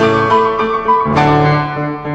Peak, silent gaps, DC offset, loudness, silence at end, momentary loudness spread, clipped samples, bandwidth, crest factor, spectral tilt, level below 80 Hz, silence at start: 0 dBFS; none; under 0.1%; -13 LUFS; 0 s; 6 LU; under 0.1%; 8 kHz; 12 dB; -7.5 dB/octave; -38 dBFS; 0 s